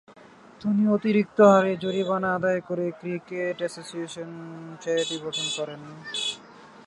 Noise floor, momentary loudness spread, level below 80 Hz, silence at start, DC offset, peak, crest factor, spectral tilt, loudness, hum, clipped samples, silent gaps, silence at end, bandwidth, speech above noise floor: -48 dBFS; 18 LU; -70 dBFS; 0.1 s; under 0.1%; -4 dBFS; 22 dB; -5 dB/octave; -25 LUFS; none; under 0.1%; none; 0.2 s; 11.5 kHz; 23 dB